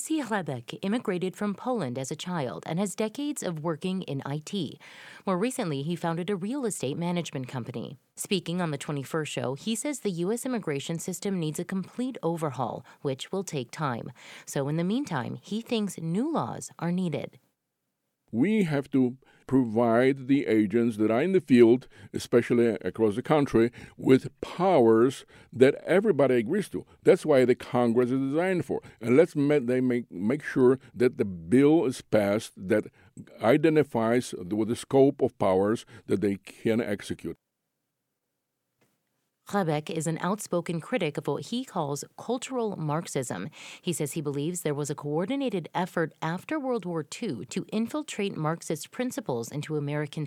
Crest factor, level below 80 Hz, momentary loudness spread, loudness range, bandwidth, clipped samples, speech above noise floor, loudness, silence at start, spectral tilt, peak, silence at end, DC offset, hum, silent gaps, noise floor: 22 dB; -66 dBFS; 12 LU; 8 LU; 16 kHz; under 0.1%; 55 dB; -28 LUFS; 0 s; -6 dB/octave; -6 dBFS; 0 s; under 0.1%; none; none; -82 dBFS